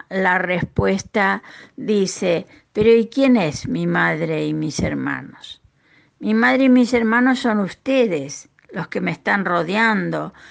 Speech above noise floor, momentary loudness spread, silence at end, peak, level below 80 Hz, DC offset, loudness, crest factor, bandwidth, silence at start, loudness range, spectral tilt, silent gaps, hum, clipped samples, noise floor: 38 dB; 14 LU; 0.2 s; -4 dBFS; -48 dBFS; under 0.1%; -19 LUFS; 14 dB; 9.4 kHz; 0.1 s; 3 LU; -5.5 dB/octave; none; none; under 0.1%; -56 dBFS